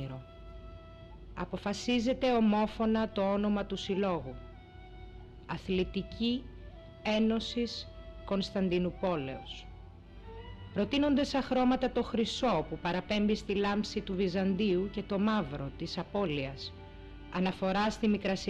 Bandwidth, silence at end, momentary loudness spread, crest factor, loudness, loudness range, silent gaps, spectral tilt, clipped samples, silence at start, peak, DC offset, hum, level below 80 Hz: 9 kHz; 0 s; 21 LU; 12 dB; -32 LUFS; 4 LU; none; -6 dB/octave; under 0.1%; 0 s; -20 dBFS; under 0.1%; none; -50 dBFS